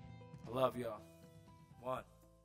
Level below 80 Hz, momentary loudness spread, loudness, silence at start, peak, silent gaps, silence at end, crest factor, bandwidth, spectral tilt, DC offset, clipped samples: -70 dBFS; 24 LU; -42 LUFS; 0 s; -20 dBFS; none; 0.15 s; 24 dB; 16 kHz; -6.5 dB/octave; under 0.1%; under 0.1%